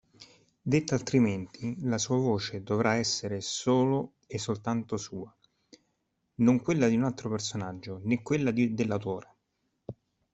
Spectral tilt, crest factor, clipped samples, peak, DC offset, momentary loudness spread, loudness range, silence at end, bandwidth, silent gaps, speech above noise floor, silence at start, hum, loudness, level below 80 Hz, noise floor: -5.5 dB/octave; 18 dB; under 0.1%; -12 dBFS; under 0.1%; 14 LU; 3 LU; 0.4 s; 8.2 kHz; none; 50 dB; 0.2 s; none; -29 LUFS; -64 dBFS; -78 dBFS